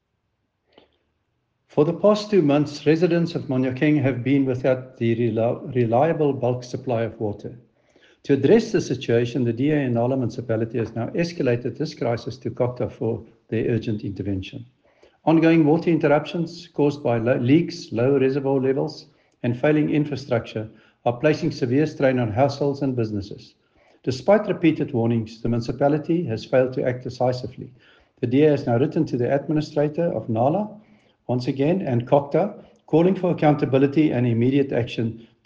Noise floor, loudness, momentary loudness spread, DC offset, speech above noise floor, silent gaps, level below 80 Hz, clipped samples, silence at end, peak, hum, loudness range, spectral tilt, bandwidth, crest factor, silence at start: -73 dBFS; -22 LUFS; 10 LU; under 0.1%; 52 dB; none; -58 dBFS; under 0.1%; 0.25 s; -4 dBFS; none; 4 LU; -8 dB/octave; 7.4 kHz; 18 dB; 1.75 s